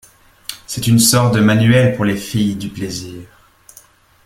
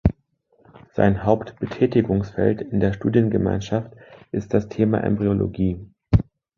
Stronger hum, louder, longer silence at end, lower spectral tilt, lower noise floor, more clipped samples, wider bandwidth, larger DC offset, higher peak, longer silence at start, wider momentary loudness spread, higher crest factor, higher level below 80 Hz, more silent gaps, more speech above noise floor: neither; first, -14 LUFS vs -22 LUFS; first, 1 s vs 0.35 s; second, -5 dB/octave vs -9 dB/octave; second, -47 dBFS vs -63 dBFS; neither; first, 16.5 kHz vs 7 kHz; neither; about the same, 0 dBFS vs -2 dBFS; first, 0.5 s vs 0.05 s; first, 20 LU vs 9 LU; about the same, 16 dB vs 20 dB; second, -46 dBFS vs -36 dBFS; neither; second, 33 dB vs 42 dB